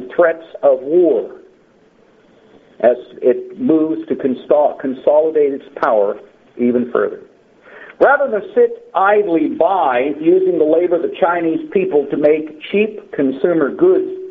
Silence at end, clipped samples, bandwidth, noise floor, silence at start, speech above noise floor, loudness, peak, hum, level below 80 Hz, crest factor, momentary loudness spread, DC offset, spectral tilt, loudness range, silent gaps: 0 s; under 0.1%; 4.4 kHz; -51 dBFS; 0 s; 36 dB; -15 LUFS; 0 dBFS; none; -62 dBFS; 16 dB; 6 LU; under 0.1%; -5 dB/octave; 3 LU; none